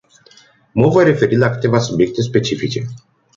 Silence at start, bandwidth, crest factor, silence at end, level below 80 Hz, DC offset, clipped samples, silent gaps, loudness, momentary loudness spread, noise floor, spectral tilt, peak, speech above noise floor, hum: 0.75 s; 7.6 kHz; 14 dB; 0.4 s; -48 dBFS; under 0.1%; under 0.1%; none; -15 LUFS; 11 LU; -49 dBFS; -6.5 dB/octave; -2 dBFS; 34 dB; none